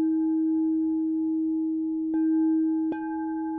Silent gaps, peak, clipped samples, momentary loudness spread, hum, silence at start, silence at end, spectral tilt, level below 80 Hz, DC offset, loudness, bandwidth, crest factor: none; -18 dBFS; under 0.1%; 6 LU; none; 0 s; 0 s; -10.5 dB/octave; -64 dBFS; under 0.1%; -26 LUFS; 2.6 kHz; 6 dB